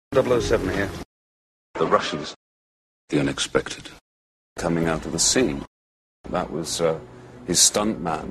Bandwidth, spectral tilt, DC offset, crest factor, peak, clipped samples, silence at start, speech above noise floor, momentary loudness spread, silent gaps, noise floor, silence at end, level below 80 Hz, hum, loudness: 13 kHz; -3 dB/octave; under 0.1%; 24 dB; -2 dBFS; under 0.1%; 0.1 s; over 67 dB; 19 LU; 1.05-1.74 s, 2.36-3.08 s, 4.01-4.56 s, 5.67-6.24 s; under -90 dBFS; 0 s; -44 dBFS; none; -22 LUFS